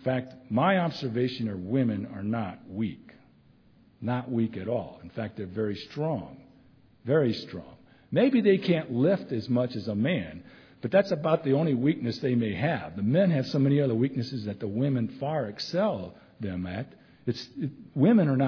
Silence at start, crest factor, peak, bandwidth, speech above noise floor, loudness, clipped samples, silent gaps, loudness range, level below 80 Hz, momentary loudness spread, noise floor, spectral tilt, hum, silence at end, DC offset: 0 s; 18 dB; -10 dBFS; 5.4 kHz; 32 dB; -28 LUFS; under 0.1%; none; 7 LU; -64 dBFS; 13 LU; -59 dBFS; -8.5 dB/octave; none; 0 s; under 0.1%